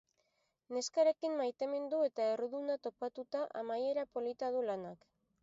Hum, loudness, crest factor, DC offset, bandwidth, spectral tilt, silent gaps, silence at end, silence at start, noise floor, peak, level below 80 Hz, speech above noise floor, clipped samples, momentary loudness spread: none; -37 LUFS; 18 dB; under 0.1%; 7.6 kHz; -3 dB/octave; none; 0.45 s; 0.7 s; -80 dBFS; -20 dBFS; -84 dBFS; 44 dB; under 0.1%; 9 LU